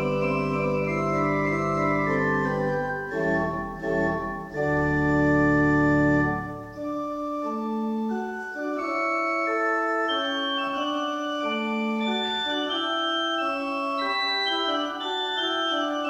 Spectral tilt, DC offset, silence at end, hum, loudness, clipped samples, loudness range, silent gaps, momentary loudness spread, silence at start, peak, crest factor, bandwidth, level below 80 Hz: -6 dB/octave; under 0.1%; 0 s; none; -25 LUFS; under 0.1%; 3 LU; none; 9 LU; 0 s; -10 dBFS; 14 dB; 9.4 kHz; -48 dBFS